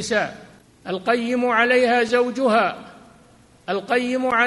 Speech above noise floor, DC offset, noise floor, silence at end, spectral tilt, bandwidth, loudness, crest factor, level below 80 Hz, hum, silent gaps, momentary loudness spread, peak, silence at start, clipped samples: 32 dB; under 0.1%; -52 dBFS; 0 s; -4 dB/octave; 11.5 kHz; -20 LUFS; 18 dB; -62 dBFS; none; none; 14 LU; -4 dBFS; 0 s; under 0.1%